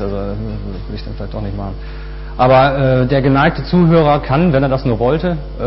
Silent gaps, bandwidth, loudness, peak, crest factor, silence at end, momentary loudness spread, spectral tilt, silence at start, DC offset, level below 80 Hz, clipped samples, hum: none; 5.8 kHz; -14 LUFS; -2 dBFS; 12 dB; 0 s; 16 LU; -12 dB/octave; 0 s; under 0.1%; -26 dBFS; under 0.1%; none